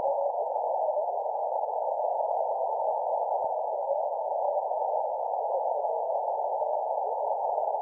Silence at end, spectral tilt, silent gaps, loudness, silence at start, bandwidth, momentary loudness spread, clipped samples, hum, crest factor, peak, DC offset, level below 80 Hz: 0 s; -8.5 dB/octave; none; -29 LUFS; 0 s; 1.2 kHz; 2 LU; under 0.1%; none; 12 dB; -16 dBFS; under 0.1%; -80 dBFS